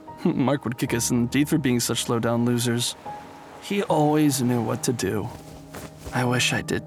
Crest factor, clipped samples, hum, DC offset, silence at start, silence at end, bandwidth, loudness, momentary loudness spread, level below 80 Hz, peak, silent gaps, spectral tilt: 16 dB; under 0.1%; none; under 0.1%; 0 s; 0 s; over 20 kHz; -23 LUFS; 18 LU; -54 dBFS; -8 dBFS; none; -4.5 dB/octave